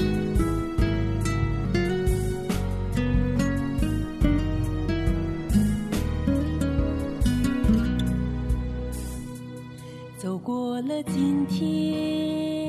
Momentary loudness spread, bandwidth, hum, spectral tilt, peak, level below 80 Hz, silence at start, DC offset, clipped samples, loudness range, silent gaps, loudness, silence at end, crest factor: 9 LU; 14 kHz; none; -7 dB/octave; -8 dBFS; -32 dBFS; 0 s; under 0.1%; under 0.1%; 4 LU; none; -26 LUFS; 0 s; 16 dB